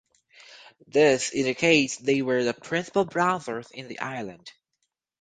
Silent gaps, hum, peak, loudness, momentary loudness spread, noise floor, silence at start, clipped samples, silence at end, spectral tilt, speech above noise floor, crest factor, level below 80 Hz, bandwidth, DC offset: none; none; -6 dBFS; -24 LUFS; 15 LU; -79 dBFS; 0.5 s; under 0.1%; 0.7 s; -4 dB/octave; 54 dB; 20 dB; -66 dBFS; 9.6 kHz; under 0.1%